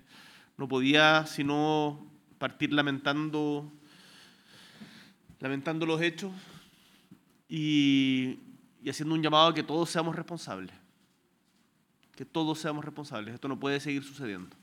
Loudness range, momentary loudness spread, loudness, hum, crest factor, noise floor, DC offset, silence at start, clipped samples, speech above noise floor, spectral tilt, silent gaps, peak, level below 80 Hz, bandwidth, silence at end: 8 LU; 18 LU; -29 LUFS; none; 24 dB; -70 dBFS; under 0.1%; 0.15 s; under 0.1%; 41 dB; -5 dB/octave; none; -6 dBFS; -78 dBFS; 15 kHz; 0.15 s